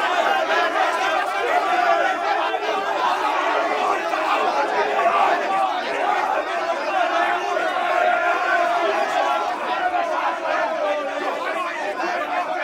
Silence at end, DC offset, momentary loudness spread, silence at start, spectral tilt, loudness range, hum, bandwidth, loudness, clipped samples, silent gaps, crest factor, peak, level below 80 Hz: 0 s; under 0.1%; 5 LU; 0 s; -2 dB/octave; 2 LU; none; 16 kHz; -21 LUFS; under 0.1%; none; 16 dB; -4 dBFS; -66 dBFS